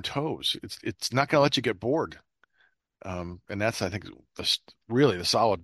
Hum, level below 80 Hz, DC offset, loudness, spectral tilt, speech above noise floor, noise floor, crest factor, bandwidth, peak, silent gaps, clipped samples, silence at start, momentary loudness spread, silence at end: none; -60 dBFS; under 0.1%; -27 LUFS; -4.5 dB/octave; 41 dB; -68 dBFS; 22 dB; 13 kHz; -6 dBFS; none; under 0.1%; 0 s; 14 LU; 0 s